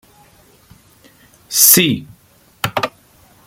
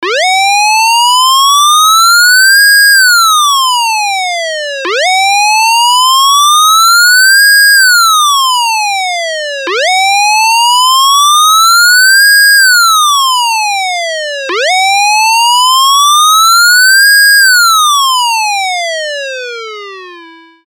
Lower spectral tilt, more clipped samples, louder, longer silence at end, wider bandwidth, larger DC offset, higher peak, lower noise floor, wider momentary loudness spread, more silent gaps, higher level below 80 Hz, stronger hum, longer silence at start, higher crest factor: first, -2 dB/octave vs 6 dB/octave; neither; second, -13 LUFS vs -5 LUFS; first, 0.55 s vs 0.4 s; second, 17 kHz vs over 20 kHz; neither; about the same, 0 dBFS vs 0 dBFS; first, -50 dBFS vs -34 dBFS; first, 17 LU vs 11 LU; neither; first, -54 dBFS vs under -90 dBFS; neither; first, 1.5 s vs 0 s; first, 20 dB vs 8 dB